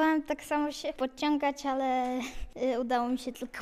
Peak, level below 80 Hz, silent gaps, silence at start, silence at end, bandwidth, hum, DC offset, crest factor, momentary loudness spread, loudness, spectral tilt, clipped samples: -14 dBFS; -52 dBFS; none; 0 s; 0 s; 15 kHz; none; under 0.1%; 16 dB; 6 LU; -31 LUFS; -3.5 dB/octave; under 0.1%